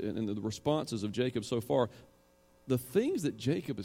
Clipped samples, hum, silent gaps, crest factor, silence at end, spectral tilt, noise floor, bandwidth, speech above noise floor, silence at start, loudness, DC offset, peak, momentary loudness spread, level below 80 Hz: under 0.1%; none; none; 18 dB; 0 s; -6 dB/octave; -65 dBFS; 16.5 kHz; 32 dB; 0 s; -33 LUFS; under 0.1%; -16 dBFS; 5 LU; -66 dBFS